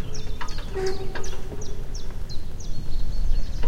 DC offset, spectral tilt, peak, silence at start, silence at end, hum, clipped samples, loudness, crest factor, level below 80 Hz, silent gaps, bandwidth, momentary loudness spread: under 0.1%; -5 dB/octave; -8 dBFS; 0 s; 0 s; none; under 0.1%; -33 LUFS; 12 dB; -26 dBFS; none; 7.2 kHz; 7 LU